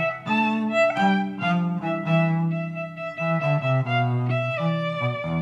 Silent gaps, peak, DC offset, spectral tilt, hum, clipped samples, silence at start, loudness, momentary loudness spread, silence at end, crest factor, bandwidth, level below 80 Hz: none; -8 dBFS; under 0.1%; -8 dB/octave; none; under 0.1%; 0 s; -23 LUFS; 5 LU; 0 s; 16 dB; 7.8 kHz; -64 dBFS